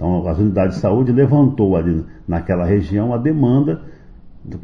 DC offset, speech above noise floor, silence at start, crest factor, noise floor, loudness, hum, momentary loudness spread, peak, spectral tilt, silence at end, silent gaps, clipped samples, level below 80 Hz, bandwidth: under 0.1%; 22 dB; 0 s; 14 dB; -38 dBFS; -16 LUFS; none; 10 LU; -2 dBFS; -10.5 dB/octave; 0 s; none; under 0.1%; -38 dBFS; 6.8 kHz